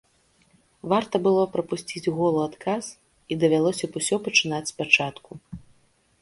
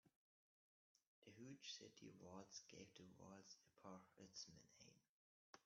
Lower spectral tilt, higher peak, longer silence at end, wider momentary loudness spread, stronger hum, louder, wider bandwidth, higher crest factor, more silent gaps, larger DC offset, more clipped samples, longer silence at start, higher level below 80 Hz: about the same, -4 dB/octave vs -3.5 dB/octave; first, -2 dBFS vs -44 dBFS; first, 0.65 s vs 0.05 s; first, 20 LU vs 8 LU; neither; first, -24 LUFS vs -62 LUFS; first, 11.5 kHz vs 7.2 kHz; about the same, 24 dB vs 22 dB; second, none vs 0.16-0.95 s, 1.07-1.22 s, 5.09-5.53 s; neither; neither; first, 0.85 s vs 0.05 s; first, -60 dBFS vs under -90 dBFS